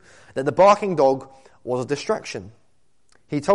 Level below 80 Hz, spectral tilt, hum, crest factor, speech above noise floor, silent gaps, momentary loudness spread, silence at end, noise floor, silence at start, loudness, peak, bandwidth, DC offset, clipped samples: -58 dBFS; -5.5 dB/octave; none; 16 dB; 47 dB; none; 18 LU; 0 s; -67 dBFS; 0.35 s; -21 LUFS; -6 dBFS; 11.5 kHz; 0.2%; under 0.1%